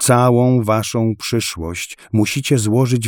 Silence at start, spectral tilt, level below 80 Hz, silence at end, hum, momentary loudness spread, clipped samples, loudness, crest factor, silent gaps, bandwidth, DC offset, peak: 0 s; -5.5 dB/octave; -46 dBFS; 0 s; none; 11 LU; under 0.1%; -17 LUFS; 14 dB; none; 19 kHz; under 0.1%; -2 dBFS